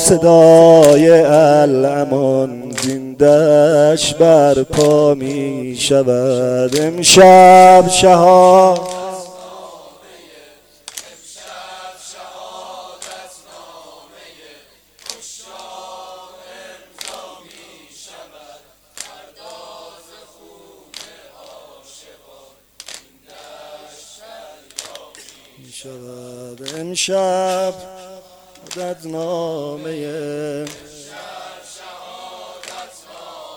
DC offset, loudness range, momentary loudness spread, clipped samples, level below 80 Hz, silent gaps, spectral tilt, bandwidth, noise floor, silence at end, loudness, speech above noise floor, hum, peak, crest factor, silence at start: under 0.1%; 27 LU; 28 LU; 0.1%; -50 dBFS; none; -4.5 dB/octave; 20 kHz; -47 dBFS; 0.15 s; -10 LUFS; 37 dB; 50 Hz at -60 dBFS; 0 dBFS; 14 dB; 0 s